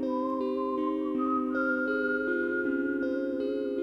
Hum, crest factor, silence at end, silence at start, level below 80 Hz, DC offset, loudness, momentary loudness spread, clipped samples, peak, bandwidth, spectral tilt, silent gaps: none; 12 dB; 0 s; 0 s; -64 dBFS; under 0.1%; -30 LUFS; 3 LU; under 0.1%; -18 dBFS; 5.8 kHz; -7 dB/octave; none